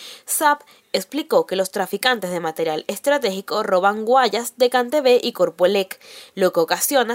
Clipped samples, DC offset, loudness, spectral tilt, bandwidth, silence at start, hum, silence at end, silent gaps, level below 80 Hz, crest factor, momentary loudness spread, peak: under 0.1%; under 0.1%; -20 LUFS; -3 dB/octave; 16.5 kHz; 0 s; none; 0 s; none; -70 dBFS; 18 dB; 8 LU; -2 dBFS